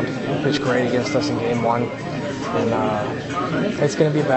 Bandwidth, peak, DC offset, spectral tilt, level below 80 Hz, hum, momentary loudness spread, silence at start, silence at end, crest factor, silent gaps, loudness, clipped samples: 8.4 kHz; -4 dBFS; under 0.1%; -6 dB/octave; -50 dBFS; none; 6 LU; 0 s; 0 s; 16 dB; none; -21 LUFS; under 0.1%